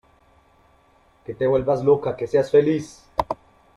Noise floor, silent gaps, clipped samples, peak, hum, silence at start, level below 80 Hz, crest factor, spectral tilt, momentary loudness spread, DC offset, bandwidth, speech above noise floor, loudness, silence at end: -58 dBFS; none; under 0.1%; -4 dBFS; none; 1.3 s; -52 dBFS; 18 dB; -7.5 dB/octave; 15 LU; under 0.1%; 11 kHz; 38 dB; -21 LUFS; 0.4 s